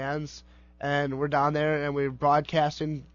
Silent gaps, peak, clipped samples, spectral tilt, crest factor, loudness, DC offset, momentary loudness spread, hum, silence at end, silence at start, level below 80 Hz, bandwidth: none; -12 dBFS; under 0.1%; -6.5 dB/octave; 16 dB; -27 LUFS; under 0.1%; 11 LU; none; 0.1 s; 0 s; -54 dBFS; 7.2 kHz